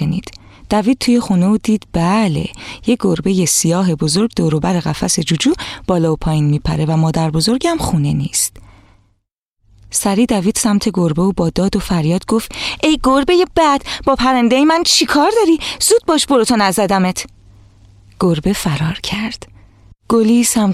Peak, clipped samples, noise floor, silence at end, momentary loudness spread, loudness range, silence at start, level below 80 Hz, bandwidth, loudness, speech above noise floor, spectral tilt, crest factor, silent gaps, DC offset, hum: -2 dBFS; under 0.1%; -68 dBFS; 0 s; 7 LU; 5 LU; 0 s; -36 dBFS; 15.5 kHz; -14 LUFS; 54 dB; -4.5 dB/octave; 14 dB; 9.32-9.57 s; under 0.1%; none